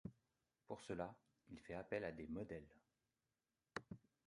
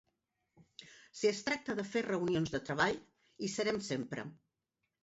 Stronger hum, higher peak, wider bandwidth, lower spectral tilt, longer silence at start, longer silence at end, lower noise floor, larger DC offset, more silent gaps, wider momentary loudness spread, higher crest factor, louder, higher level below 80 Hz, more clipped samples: neither; second, -28 dBFS vs -18 dBFS; first, 11 kHz vs 8 kHz; first, -6.5 dB/octave vs -4 dB/octave; second, 0.05 s vs 0.8 s; second, 0.3 s vs 0.7 s; about the same, under -90 dBFS vs -87 dBFS; neither; neither; second, 14 LU vs 20 LU; first, 26 dB vs 20 dB; second, -52 LUFS vs -36 LUFS; about the same, -72 dBFS vs -68 dBFS; neither